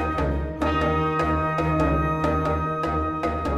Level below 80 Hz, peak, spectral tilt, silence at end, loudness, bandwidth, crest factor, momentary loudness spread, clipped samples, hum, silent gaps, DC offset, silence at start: -32 dBFS; -10 dBFS; -7.5 dB/octave; 0 s; -24 LUFS; 12 kHz; 12 dB; 4 LU; under 0.1%; none; none; under 0.1%; 0 s